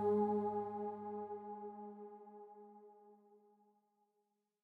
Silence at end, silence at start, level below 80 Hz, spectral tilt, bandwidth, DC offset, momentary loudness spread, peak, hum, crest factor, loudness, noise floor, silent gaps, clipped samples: 1.25 s; 0 s; -86 dBFS; -10.5 dB/octave; 3.5 kHz; under 0.1%; 23 LU; -26 dBFS; none; 16 dB; -42 LUFS; -85 dBFS; none; under 0.1%